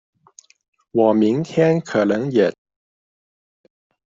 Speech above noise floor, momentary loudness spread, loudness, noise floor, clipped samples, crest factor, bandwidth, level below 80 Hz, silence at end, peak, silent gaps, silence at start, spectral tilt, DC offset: 34 dB; 4 LU; -18 LUFS; -51 dBFS; under 0.1%; 18 dB; 7.6 kHz; -64 dBFS; 1.65 s; -4 dBFS; none; 0.95 s; -7.5 dB/octave; under 0.1%